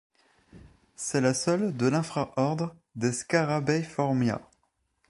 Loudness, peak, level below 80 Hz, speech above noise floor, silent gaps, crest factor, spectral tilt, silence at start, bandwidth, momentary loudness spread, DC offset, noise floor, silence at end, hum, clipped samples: -28 LUFS; -8 dBFS; -64 dBFS; 47 dB; none; 20 dB; -5.5 dB/octave; 0.55 s; 11.5 kHz; 7 LU; under 0.1%; -74 dBFS; 0.7 s; none; under 0.1%